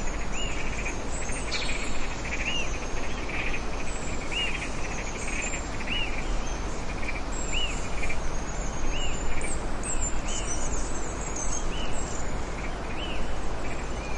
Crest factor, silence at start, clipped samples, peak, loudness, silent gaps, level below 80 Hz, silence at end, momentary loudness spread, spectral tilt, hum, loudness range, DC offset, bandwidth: 14 dB; 0 s; under 0.1%; -14 dBFS; -32 LUFS; none; -32 dBFS; 0 s; 5 LU; -3 dB/octave; none; 1 LU; under 0.1%; 10.5 kHz